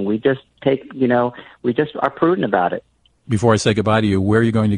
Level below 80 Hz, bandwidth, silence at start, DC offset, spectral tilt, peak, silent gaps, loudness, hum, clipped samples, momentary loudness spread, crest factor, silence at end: -48 dBFS; 10.5 kHz; 0 s; under 0.1%; -6.5 dB/octave; -2 dBFS; none; -18 LUFS; none; under 0.1%; 7 LU; 16 dB; 0 s